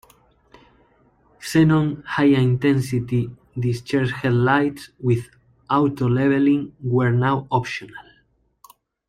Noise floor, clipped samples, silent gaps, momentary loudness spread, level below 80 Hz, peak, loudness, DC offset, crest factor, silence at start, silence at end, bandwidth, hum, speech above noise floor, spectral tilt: -62 dBFS; under 0.1%; none; 9 LU; -52 dBFS; -4 dBFS; -20 LUFS; under 0.1%; 18 dB; 1.4 s; 1.1 s; 14 kHz; none; 43 dB; -7.5 dB/octave